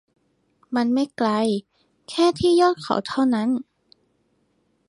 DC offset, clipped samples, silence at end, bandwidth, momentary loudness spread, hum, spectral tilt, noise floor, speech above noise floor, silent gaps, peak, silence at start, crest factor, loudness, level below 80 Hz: under 0.1%; under 0.1%; 1.25 s; 11.5 kHz; 10 LU; none; -5.5 dB/octave; -67 dBFS; 47 dB; none; -4 dBFS; 0.7 s; 18 dB; -22 LUFS; -58 dBFS